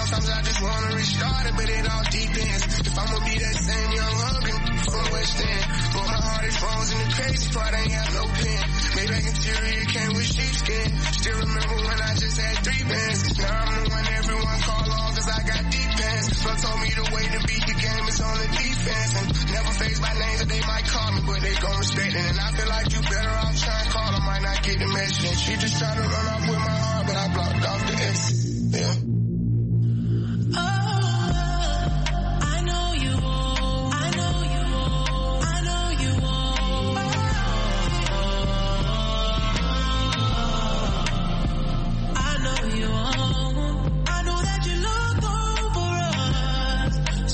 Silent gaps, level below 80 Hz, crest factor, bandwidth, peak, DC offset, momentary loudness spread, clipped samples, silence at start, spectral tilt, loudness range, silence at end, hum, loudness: none; -26 dBFS; 14 dB; 8.8 kHz; -10 dBFS; under 0.1%; 2 LU; under 0.1%; 0 s; -4 dB/octave; 1 LU; 0 s; none; -24 LUFS